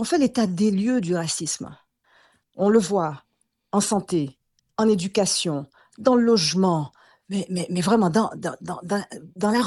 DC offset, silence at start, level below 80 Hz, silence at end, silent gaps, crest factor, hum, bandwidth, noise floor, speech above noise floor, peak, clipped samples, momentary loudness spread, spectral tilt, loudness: under 0.1%; 0 s; -62 dBFS; 0 s; none; 20 dB; none; 12.5 kHz; -60 dBFS; 38 dB; -4 dBFS; under 0.1%; 12 LU; -5 dB/octave; -23 LUFS